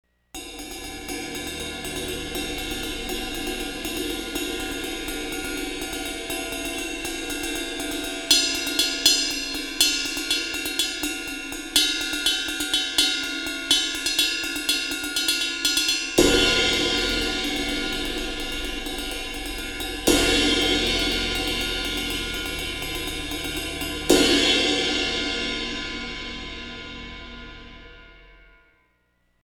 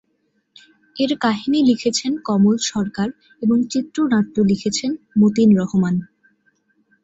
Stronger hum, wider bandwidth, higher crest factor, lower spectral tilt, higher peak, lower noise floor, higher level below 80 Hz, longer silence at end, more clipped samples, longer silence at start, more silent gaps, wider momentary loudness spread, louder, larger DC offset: neither; first, over 20 kHz vs 8 kHz; first, 26 dB vs 14 dB; second, -1.5 dB/octave vs -5.5 dB/octave; first, 0 dBFS vs -4 dBFS; about the same, -67 dBFS vs -67 dBFS; first, -40 dBFS vs -58 dBFS; about the same, 1.1 s vs 1 s; neither; second, 0.35 s vs 0.95 s; neither; first, 13 LU vs 9 LU; second, -23 LUFS vs -18 LUFS; neither